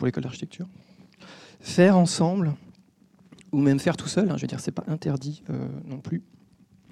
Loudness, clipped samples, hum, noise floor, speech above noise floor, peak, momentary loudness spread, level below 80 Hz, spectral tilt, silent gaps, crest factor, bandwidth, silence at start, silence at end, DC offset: -25 LUFS; under 0.1%; none; -58 dBFS; 34 dB; -6 dBFS; 18 LU; -64 dBFS; -6.5 dB/octave; none; 20 dB; 12 kHz; 0 s; 0.7 s; under 0.1%